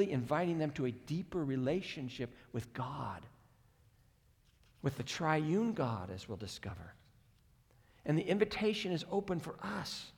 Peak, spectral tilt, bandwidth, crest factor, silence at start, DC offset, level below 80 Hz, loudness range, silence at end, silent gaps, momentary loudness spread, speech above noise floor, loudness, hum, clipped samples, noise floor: -16 dBFS; -6 dB/octave; 18.5 kHz; 22 dB; 0 s; under 0.1%; -66 dBFS; 5 LU; 0.05 s; none; 12 LU; 32 dB; -37 LUFS; none; under 0.1%; -69 dBFS